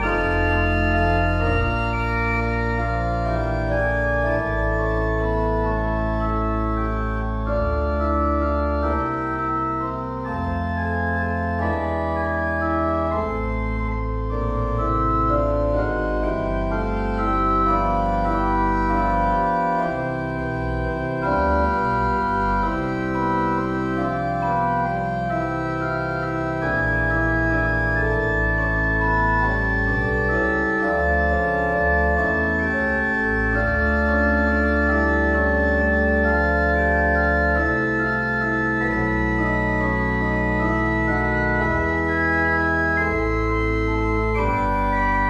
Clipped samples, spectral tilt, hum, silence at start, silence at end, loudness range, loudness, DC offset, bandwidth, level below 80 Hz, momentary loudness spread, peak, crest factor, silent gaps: under 0.1%; -8 dB/octave; none; 0 s; 0 s; 4 LU; -21 LUFS; under 0.1%; 7.4 kHz; -28 dBFS; 5 LU; -6 dBFS; 14 dB; none